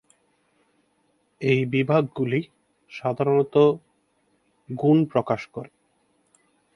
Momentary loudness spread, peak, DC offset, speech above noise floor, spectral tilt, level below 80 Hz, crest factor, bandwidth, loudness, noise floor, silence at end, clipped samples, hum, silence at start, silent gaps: 18 LU; -6 dBFS; under 0.1%; 46 dB; -8.5 dB/octave; -66 dBFS; 20 dB; 11 kHz; -23 LUFS; -68 dBFS; 1.1 s; under 0.1%; none; 1.4 s; none